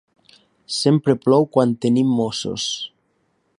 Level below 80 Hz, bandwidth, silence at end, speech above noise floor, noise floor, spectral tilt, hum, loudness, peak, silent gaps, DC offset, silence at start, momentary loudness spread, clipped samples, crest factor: -62 dBFS; 11.5 kHz; 0.7 s; 48 dB; -66 dBFS; -5.5 dB/octave; none; -19 LUFS; -2 dBFS; none; under 0.1%; 0.7 s; 10 LU; under 0.1%; 18 dB